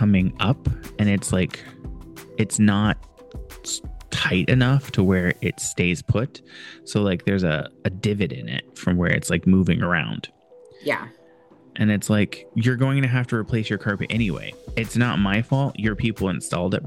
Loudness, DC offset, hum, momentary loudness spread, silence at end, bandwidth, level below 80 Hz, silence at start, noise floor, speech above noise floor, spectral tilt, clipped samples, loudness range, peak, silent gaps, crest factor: -22 LUFS; under 0.1%; none; 14 LU; 0 s; 16 kHz; -42 dBFS; 0 s; -52 dBFS; 30 dB; -5.5 dB/octave; under 0.1%; 2 LU; -4 dBFS; none; 18 dB